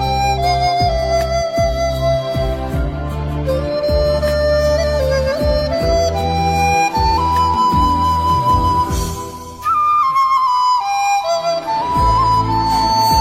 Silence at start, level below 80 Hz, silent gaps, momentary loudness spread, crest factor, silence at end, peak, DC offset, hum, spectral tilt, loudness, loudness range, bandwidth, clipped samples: 0 s; -26 dBFS; none; 6 LU; 12 dB; 0 s; -4 dBFS; under 0.1%; none; -5 dB/octave; -16 LUFS; 3 LU; 16.5 kHz; under 0.1%